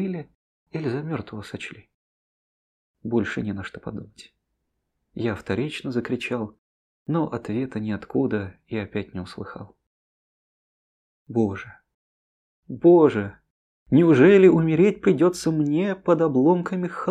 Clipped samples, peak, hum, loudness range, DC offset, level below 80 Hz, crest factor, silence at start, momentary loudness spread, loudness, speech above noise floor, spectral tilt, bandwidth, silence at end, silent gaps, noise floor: under 0.1%; -4 dBFS; none; 14 LU; under 0.1%; -60 dBFS; 20 dB; 0 s; 20 LU; -22 LUFS; 55 dB; -7.5 dB/octave; 11.5 kHz; 0 s; 0.35-0.66 s, 1.94-2.94 s, 6.58-7.06 s, 9.87-11.26 s, 11.94-12.63 s, 13.50-13.86 s; -77 dBFS